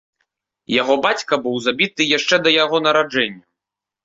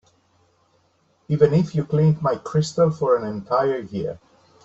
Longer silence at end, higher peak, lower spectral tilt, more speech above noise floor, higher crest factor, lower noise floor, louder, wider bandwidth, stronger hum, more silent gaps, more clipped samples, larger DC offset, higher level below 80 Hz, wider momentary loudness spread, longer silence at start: first, 0.65 s vs 0.5 s; first, 0 dBFS vs -4 dBFS; second, -3 dB/octave vs -8 dB/octave; first, 68 dB vs 43 dB; about the same, 18 dB vs 20 dB; first, -85 dBFS vs -63 dBFS; first, -17 LUFS vs -21 LUFS; about the same, 7.8 kHz vs 8 kHz; neither; neither; neither; neither; second, -62 dBFS vs -56 dBFS; second, 6 LU vs 11 LU; second, 0.7 s vs 1.3 s